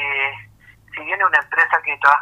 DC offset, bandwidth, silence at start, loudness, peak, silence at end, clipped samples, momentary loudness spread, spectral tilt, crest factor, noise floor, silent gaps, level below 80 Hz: under 0.1%; 14.5 kHz; 0 s; -17 LUFS; 0 dBFS; 0 s; under 0.1%; 17 LU; -3 dB/octave; 20 dB; -48 dBFS; none; -60 dBFS